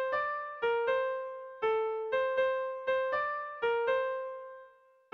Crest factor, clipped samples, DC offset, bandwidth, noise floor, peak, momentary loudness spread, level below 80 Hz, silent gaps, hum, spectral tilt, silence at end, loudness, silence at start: 12 dB; under 0.1%; under 0.1%; 6.2 kHz; -59 dBFS; -20 dBFS; 11 LU; -72 dBFS; none; none; -4 dB/octave; 0.45 s; -32 LUFS; 0 s